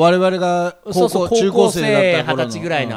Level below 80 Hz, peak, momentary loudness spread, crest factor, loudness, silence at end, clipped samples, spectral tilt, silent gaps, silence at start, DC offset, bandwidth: -50 dBFS; 0 dBFS; 7 LU; 16 dB; -16 LUFS; 0 s; under 0.1%; -5 dB/octave; none; 0 s; under 0.1%; 16 kHz